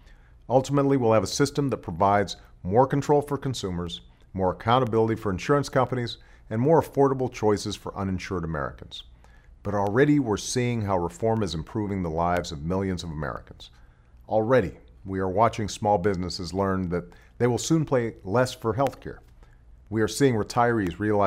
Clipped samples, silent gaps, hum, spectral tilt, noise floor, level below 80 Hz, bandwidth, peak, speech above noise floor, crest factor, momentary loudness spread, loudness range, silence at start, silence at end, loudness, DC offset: under 0.1%; none; none; -6 dB/octave; -51 dBFS; -48 dBFS; 16 kHz; -6 dBFS; 27 dB; 18 dB; 12 LU; 4 LU; 0.1 s; 0 s; -25 LUFS; under 0.1%